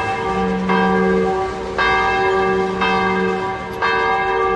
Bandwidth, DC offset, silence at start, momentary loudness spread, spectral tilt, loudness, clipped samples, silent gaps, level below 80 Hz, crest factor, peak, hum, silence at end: 12 kHz; under 0.1%; 0 s; 5 LU; -6 dB/octave; -17 LUFS; under 0.1%; none; -40 dBFS; 14 dB; -4 dBFS; none; 0 s